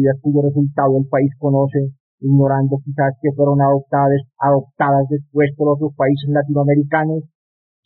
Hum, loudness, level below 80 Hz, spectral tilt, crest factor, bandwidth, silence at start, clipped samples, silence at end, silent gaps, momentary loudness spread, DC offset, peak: none; -17 LUFS; -56 dBFS; -8.5 dB/octave; 12 dB; 4.2 kHz; 0 s; under 0.1%; 0.6 s; 2.00-2.18 s; 5 LU; under 0.1%; -4 dBFS